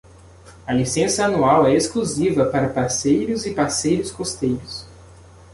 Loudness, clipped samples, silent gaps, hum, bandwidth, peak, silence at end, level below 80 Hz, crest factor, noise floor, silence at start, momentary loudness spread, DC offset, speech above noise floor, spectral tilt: -20 LUFS; under 0.1%; none; none; 11.5 kHz; -4 dBFS; 0.4 s; -46 dBFS; 16 dB; -45 dBFS; 0.45 s; 10 LU; under 0.1%; 26 dB; -4.5 dB/octave